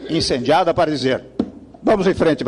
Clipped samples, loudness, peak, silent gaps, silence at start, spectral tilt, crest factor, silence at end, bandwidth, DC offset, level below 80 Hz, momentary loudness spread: under 0.1%; -18 LUFS; -6 dBFS; none; 0 s; -5.5 dB/octave; 12 dB; 0 s; 11.5 kHz; under 0.1%; -44 dBFS; 11 LU